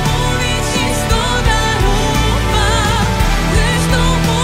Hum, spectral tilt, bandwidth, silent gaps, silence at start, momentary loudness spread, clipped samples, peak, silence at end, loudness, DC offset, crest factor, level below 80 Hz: none; -4 dB/octave; 16 kHz; none; 0 s; 2 LU; under 0.1%; 0 dBFS; 0 s; -14 LUFS; under 0.1%; 12 dB; -18 dBFS